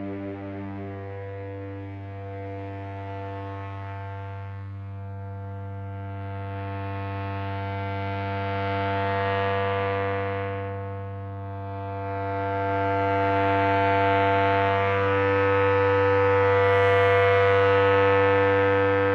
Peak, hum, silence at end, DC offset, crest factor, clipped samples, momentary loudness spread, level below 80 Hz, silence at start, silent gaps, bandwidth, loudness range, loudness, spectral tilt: -8 dBFS; none; 0 s; under 0.1%; 16 dB; under 0.1%; 17 LU; -62 dBFS; 0 s; none; 6.2 kHz; 16 LU; -23 LUFS; -8 dB/octave